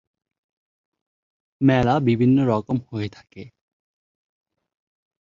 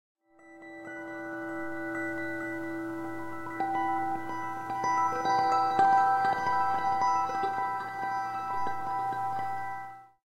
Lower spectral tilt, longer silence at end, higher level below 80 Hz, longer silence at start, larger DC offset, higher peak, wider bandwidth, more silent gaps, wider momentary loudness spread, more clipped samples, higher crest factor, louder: first, -8.5 dB/octave vs -4.5 dB/octave; first, 1.75 s vs 0.2 s; first, -52 dBFS vs -68 dBFS; first, 1.6 s vs 0.45 s; neither; first, -6 dBFS vs -12 dBFS; second, 7.2 kHz vs 15.5 kHz; neither; about the same, 13 LU vs 13 LU; neither; about the same, 18 dB vs 20 dB; first, -20 LUFS vs -30 LUFS